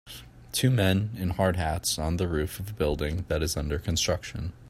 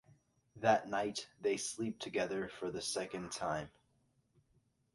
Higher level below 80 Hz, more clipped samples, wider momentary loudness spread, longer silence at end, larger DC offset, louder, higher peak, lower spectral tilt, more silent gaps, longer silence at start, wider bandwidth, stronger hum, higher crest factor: first, -40 dBFS vs -70 dBFS; neither; about the same, 8 LU vs 9 LU; second, 0 s vs 1.25 s; neither; first, -28 LUFS vs -38 LUFS; first, -8 dBFS vs -18 dBFS; first, -5 dB/octave vs -3.5 dB/octave; neither; second, 0.05 s vs 0.55 s; first, 16 kHz vs 11.5 kHz; neither; about the same, 20 dB vs 22 dB